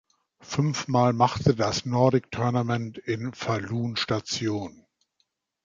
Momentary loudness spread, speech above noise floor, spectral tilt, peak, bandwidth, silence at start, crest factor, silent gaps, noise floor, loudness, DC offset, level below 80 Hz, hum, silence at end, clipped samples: 9 LU; 50 dB; -5.5 dB/octave; -8 dBFS; 7.6 kHz; 0.45 s; 20 dB; none; -75 dBFS; -26 LUFS; under 0.1%; -54 dBFS; none; 0.95 s; under 0.1%